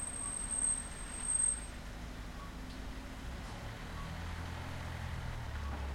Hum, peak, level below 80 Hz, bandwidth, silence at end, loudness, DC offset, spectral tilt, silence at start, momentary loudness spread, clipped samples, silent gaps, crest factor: none; -24 dBFS; -46 dBFS; 16 kHz; 0 s; -39 LUFS; under 0.1%; -2.5 dB/octave; 0 s; 15 LU; under 0.1%; none; 16 dB